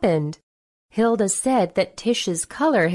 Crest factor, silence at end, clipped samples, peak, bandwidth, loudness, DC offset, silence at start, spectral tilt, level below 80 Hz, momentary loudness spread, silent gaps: 14 dB; 0 s; under 0.1%; -8 dBFS; 12 kHz; -22 LUFS; under 0.1%; 0 s; -4.5 dB/octave; -56 dBFS; 6 LU; 0.43-0.89 s